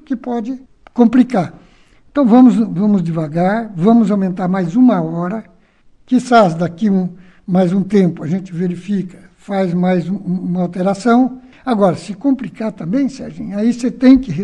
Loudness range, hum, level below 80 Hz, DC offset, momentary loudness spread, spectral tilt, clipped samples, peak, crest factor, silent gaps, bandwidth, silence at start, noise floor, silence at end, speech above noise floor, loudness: 4 LU; none; -48 dBFS; under 0.1%; 12 LU; -8 dB/octave; under 0.1%; 0 dBFS; 14 dB; none; 9.6 kHz; 0.1 s; -49 dBFS; 0 s; 35 dB; -15 LUFS